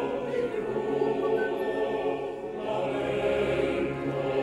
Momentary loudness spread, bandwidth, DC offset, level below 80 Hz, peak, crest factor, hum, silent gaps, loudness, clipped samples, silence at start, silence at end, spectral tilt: 5 LU; 12.5 kHz; under 0.1%; -54 dBFS; -14 dBFS; 14 dB; none; none; -29 LUFS; under 0.1%; 0 s; 0 s; -6.5 dB/octave